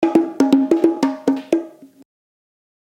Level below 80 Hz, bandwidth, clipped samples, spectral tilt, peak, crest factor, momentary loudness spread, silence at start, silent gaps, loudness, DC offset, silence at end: -66 dBFS; 12 kHz; under 0.1%; -6 dB/octave; 0 dBFS; 18 dB; 8 LU; 0 s; none; -18 LUFS; under 0.1%; 1.05 s